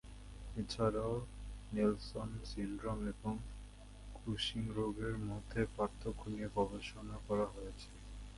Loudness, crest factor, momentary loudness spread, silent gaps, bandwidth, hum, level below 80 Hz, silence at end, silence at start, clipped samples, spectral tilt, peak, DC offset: -41 LUFS; 20 dB; 16 LU; none; 11.5 kHz; none; -50 dBFS; 0 s; 0.05 s; under 0.1%; -6 dB/octave; -20 dBFS; under 0.1%